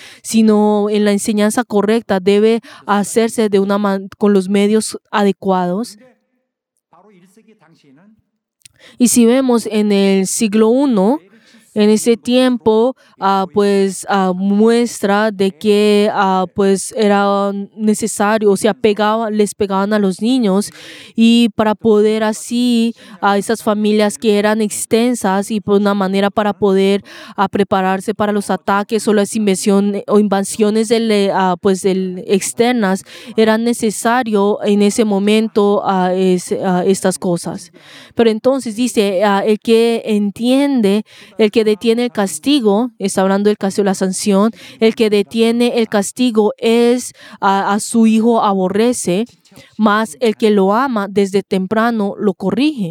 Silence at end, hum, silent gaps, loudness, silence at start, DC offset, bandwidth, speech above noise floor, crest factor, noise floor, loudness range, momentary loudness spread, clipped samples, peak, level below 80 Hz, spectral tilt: 0 s; none; none; -14 LUFS; 0 s; under 0.1%; 16 kHz; 58 dB; 14 dB; -72 dBFS; 2 LU; 5 LU; under 0.1%; 0 dBFS; -58 dBFS; -5 dB/octave